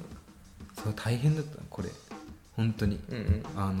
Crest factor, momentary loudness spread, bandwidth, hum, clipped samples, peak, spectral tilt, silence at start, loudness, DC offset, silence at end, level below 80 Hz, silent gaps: 16 dB; 18 LU; 16 kHz; none; under 0.1%; -16 dBFS; -7 dB/octave; 0 s; -32 LUFS; under 0.1%; 0 s; -46 dBFS; none